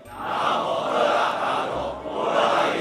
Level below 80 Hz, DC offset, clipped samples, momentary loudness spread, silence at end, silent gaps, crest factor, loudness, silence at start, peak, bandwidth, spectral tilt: -54 dBFS; under 0.1%; under 0.1%; 8 LU; 0 s; none; 16 dB; -23 LUFS; 0 s; -8 dBFS; 14.5 kHz; -4 dB/octave